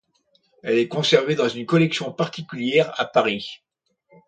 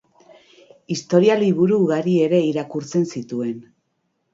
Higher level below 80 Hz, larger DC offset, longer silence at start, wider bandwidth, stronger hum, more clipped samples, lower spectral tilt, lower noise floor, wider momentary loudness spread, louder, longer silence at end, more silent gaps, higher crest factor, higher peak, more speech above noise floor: about the same, -68 dBFS vs -68 dBFS; neither; second, 0.65 s vs 0.9 s; first, 9.2 kHz vs 7.8 kHz; neither; neither; second, -5.5 dB/octave vs -7 dB/octave; second, -65 dBFS vs -71 dBFS; second, 9 LU vs 12 LU; about the same, -21 LUFS vs -19 LUFS; about the same, 0.7 s vs 0.7 s; neither; about the same, 20 dB vs 18 dB; about the same, -2 dBFS vs -2 dBFS; second, 44 dB vs 53 dB